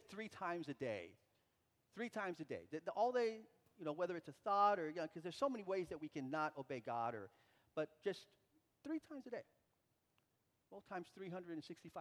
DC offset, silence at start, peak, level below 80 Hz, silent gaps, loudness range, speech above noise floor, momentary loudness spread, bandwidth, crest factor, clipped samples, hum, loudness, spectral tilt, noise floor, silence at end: under 0.1%; 0.1 s; -24 dBFS; -86 dBFS; none; 11 LU; 40 dB; 15 LU; 15.5 kHz; 22 dB; under 0.1%; none; -45 LUFS; -6 dB/octave; -84 dBFS; 0 s